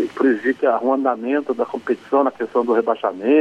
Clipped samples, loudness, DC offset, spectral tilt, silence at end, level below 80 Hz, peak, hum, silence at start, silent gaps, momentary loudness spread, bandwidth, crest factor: under 0.1%; -20 LUFS; under 0.1%; -6.5 dB/octave; 0 s; -68 dBFS; -6 dBFS; none; 0 s; none; 5 LU; 8 kHz; 14 dB